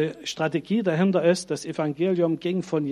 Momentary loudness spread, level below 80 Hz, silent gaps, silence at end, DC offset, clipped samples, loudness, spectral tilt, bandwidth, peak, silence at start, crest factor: 7 LU; -68 dBFS; none; 0 s; under 0.1%; under 0.1%; -24 LUFS; -6 dB/octave; 12 kHz; -8 dBFS; 0 s; 16 dB